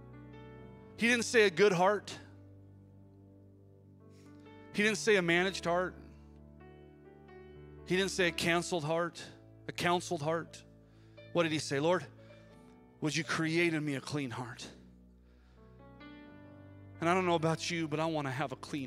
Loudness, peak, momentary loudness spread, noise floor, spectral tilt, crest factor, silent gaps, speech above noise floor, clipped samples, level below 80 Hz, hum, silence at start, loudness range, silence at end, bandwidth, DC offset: -32 LUFS; -14 dBFS; 25 LU; -60 dBFS; -4.5 dB/octave; 22 dB; none; 28 dB; under 0.1%; -64 dBFS; none; 0 s; 6 LU; 0 s; 15.5 kHz; under 0.1%